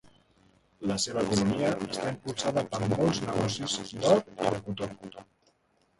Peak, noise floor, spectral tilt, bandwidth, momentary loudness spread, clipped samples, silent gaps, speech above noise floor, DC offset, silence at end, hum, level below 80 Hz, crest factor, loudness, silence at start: -10 dBFS; -70 dBFS; -5 dB/octave; 11.5 kHz; 11 LU; under 0.1%; none; 41 dB; under 0.1%; 0.75 s; none; -58 dBFS; 20 dB; -29 LUFS; 0.8 s